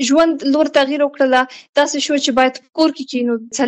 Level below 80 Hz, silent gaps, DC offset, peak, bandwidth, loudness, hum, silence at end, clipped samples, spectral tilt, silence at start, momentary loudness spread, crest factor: -56 dBFS; 1.69-1.73 s; under 0.1%; -4 dBFS; 8.6 kHz; -16 LUFS; none; 0 s; under 0.1%; -2 dB/octave; 0 s; 5 LU; 12 dB